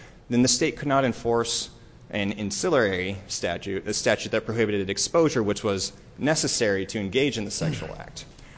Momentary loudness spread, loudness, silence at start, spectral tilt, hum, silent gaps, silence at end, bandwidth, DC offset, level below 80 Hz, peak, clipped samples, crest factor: 9 LU; -25 LUFS; 0 s; -4 dB/octave; none; none; 0 s; 8 kHz; under 0.1%; -50 dBFS; -8 dBFS; under 0.1%; 18 dB